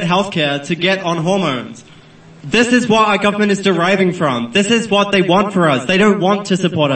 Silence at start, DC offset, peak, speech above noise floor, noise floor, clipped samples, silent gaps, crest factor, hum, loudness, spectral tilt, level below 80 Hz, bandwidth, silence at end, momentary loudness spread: 0 s; 0.2%; 0 dBFS; 27 dB; -41 dBFS; under 0.1%; none; 14 dB; none; -14 LUFS; -5 dB/octave; -54 dBFS; 8.8 kHz; 0 s; 5 LU